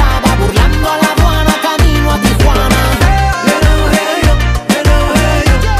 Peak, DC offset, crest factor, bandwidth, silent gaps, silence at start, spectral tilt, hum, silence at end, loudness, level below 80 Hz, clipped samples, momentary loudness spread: 0 dBFS; under 0.1%; 8 dB; 15.5 kHz; none; 0 s; -5 dB/octave; none; 0 s; -11 LUFS; -12 dBFS; under 0.1%; 2 LU